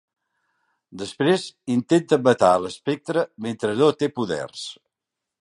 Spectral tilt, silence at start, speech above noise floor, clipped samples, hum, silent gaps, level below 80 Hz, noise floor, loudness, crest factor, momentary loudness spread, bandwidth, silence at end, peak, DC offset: -5.5 dB/octave; 0.95 s; 63 dB; under 0.1%; none; none; -62 dBFS; -85 dBFS; -22 LUFS; 20 dB; 15 LU; 11.5 kHz; 0.7 s; -2 dBFS; under 0.1%